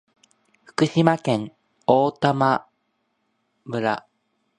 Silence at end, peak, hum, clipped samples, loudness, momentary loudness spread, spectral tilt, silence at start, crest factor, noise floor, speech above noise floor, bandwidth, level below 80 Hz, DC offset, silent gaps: 0.6 s; 0 dBFS; none; under 0.1%; -22 LUFS; 12 LU; -6.5 dB/octave; 0.8 s; 24 dB; -72 dBFS; 52 dB; 11 kHz; -64 dBFS; under 0.1%; none